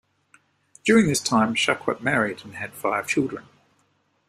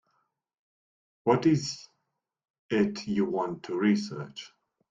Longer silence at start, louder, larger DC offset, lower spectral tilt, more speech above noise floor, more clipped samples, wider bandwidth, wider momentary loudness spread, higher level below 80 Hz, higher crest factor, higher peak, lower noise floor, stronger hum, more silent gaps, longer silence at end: second, 0.85 s vs 1.25 s; first, -22 LUFS vs -28 LUFS; neither; second, -4 dB/octave vs -6 dB/octave; second, 45 dB vs 54 dB; neither; first, 14.5 kHz vs 7.8 kHz; second, 12 LU vs 17 LU; first, -60 dBFS vs -68 dBFS; about the same, 20 dB vs 22 dB; first, -4 dBFS vs -8 dBFS; second, -67 dBFS vs -82 dBFS; neither; second, none vs 2.50-2.69 s; first, 0.85 s vs 0.45 s